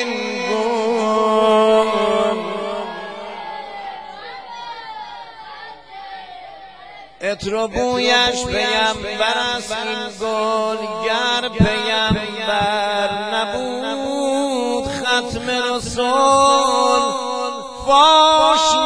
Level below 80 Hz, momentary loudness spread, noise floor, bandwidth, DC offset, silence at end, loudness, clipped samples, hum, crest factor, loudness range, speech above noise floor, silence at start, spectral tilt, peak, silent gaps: -44 dBFS; 20 LU; -39 dBFS; 11 kHz; 0.3%; 0 s; -17 LUFS; under 0.1%; none; 18 dB; 15 LU; 21 dB; 0 s; -3.5 dB/octave; 0 dBFS; none